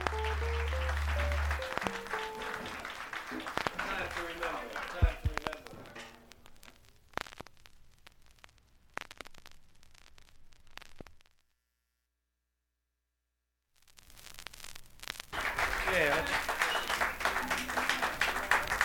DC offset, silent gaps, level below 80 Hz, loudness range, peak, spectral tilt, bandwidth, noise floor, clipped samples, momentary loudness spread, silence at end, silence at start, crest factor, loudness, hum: under 0.1%; none; -44 dBFS; 21 LU; -10 dBFS; -3.5 dB/octave; 17.5 kHz; -85 dBFS; under 0.1%; 20 LU; 0 s; 0 s; 28 dB; -34 LUFS; 60 Hz at -70 dBFS